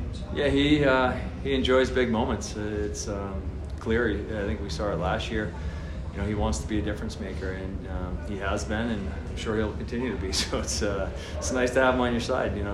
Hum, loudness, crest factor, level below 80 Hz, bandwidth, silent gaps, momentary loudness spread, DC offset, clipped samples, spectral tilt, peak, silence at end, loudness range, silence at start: none; -28 LUFS; 18 dB; -36 dBFS; 12.5 kHz; none; 11 LU; under 0.1%; under 0.1%; -5 dB/octave; -10 dBFS; 0 s; 6 LU; 0 s